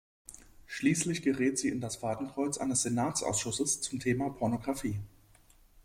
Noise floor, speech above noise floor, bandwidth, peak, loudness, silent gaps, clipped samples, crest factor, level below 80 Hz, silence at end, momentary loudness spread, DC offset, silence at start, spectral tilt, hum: -61 dBFS; 29 dB; 16 kHz; -16 dBFS; -32 LUFS; none; under 0.1%; 18 dB; -60 dBFS; 0.75 s; 12 LU; under 0.1%; 0.3 s; -4 dB/octave; none